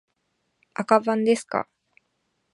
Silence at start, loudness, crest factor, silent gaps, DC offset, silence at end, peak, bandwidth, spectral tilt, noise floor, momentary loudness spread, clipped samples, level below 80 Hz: 0.8 s; -23 LUFS; 24 dB; none; under 0.1%; 0.9 s; -2 dBFS; 11.5 kHz; -5 dB/octave; -74 dBFS; 16 LU; under 0.1%; -74 dBFS